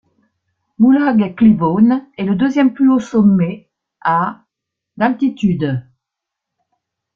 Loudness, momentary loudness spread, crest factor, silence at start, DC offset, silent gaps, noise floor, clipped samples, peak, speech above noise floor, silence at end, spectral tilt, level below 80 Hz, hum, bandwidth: -15 LUFS; 9 LU; 14 dB; 0.8 s; under 0.1%; none; -81 dBFS; under 0.1%; -2 dBFS; 68 dB; 1.35 s; -8.5 dB/octave; -52 dBFS; none; 7.2 kHz